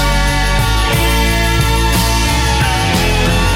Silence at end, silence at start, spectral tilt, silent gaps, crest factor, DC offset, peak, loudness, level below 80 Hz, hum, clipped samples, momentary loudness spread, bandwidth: 0 s; 0 s; -4 dB/octave; none; 10 dB; under 0.1%; -2 dBFS; -13 LUFS; -16 dBFS; none; under 0.1%; 1 LU; 17 kHz